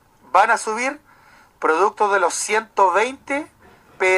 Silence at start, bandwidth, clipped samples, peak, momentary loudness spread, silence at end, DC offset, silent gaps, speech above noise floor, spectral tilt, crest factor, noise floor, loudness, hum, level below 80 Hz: 0.35 s; 14 kHz; under 0.1%; -2 dBFS; 10 LU; 0 s; under 0.1%; none; 32 dB; -1.5 dB/octave; 18 dB; -51 dBFS; -19 LUFS; none; -64 dBFS